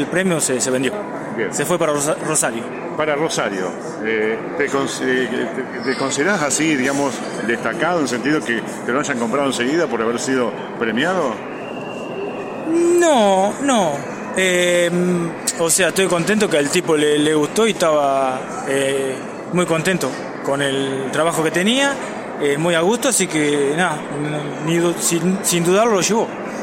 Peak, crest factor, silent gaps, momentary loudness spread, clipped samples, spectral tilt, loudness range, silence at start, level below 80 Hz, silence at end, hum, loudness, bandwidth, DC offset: -4 dBFS; 14 dB; none; 9 LU; under 0.1%; -3.5 dB/octave; 4 LU; 0 s; -60 dBFS; 0 s; none; -18 LUFS; 16.5 kHz; under 0.1%